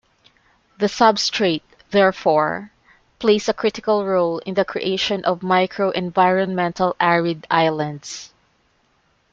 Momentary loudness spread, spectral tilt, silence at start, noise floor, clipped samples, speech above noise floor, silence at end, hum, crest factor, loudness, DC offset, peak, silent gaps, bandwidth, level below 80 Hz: 8 LU; -4.5 dB/octave; 0.8 s; -63 dBFS; under 0.1%; 44 dB; 1.05 s; none; 18 dB; -19 LUFS; under 0.1%; -2 dBFS; none; 7.8 kHz; -58 dBFS